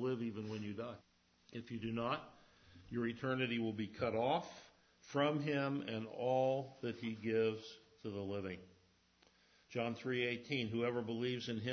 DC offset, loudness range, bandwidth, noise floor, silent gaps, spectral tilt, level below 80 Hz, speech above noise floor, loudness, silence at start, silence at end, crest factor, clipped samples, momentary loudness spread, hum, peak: under 0.1%; 5 LU; 6.4 kHz; -72 dBFS; none; -4.5 dB/octave; -72 dBFS; 32 dB; -40 LUFS; 0 s; 0 s; 18 dB; under 0.1%; 13 LU; none; -22 dBFS